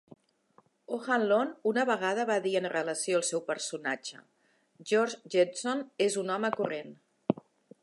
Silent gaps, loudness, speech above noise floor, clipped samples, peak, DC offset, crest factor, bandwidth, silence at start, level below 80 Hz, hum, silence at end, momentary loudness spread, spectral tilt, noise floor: none; -30 LUFS; 36 dB; under 0.1%; -10 dBFS; under 0.1%; 22 dB; 11.5 kHz; 0.9 s; -82 dBFS; none; 0.5 s; 10 LU; -3.5 dB/octave; -66 dBFS